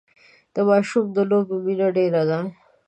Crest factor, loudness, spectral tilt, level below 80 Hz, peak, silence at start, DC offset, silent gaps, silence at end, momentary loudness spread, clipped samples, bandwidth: 16 dB; -21 LUFS; -7.5 dB/octave; -72 dBFS; -6 dBFS; 0.55 s; under 0.1%; none; 0.35 s; 8 LU; under 0.1%; 9.2 kHz